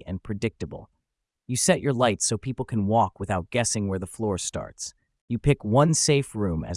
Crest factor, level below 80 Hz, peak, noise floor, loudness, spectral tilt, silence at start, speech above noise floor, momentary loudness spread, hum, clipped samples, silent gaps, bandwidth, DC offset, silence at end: 20 dB; -48 dBFS; -6 dBFS; -82 dBFS; -25 LUFS; -4.5 dB/octave; 0 s; 57 dB; 13 LU; none; under 0.1%; 5.21-5.28 s; 12 kHz; under 0.1%; 0 s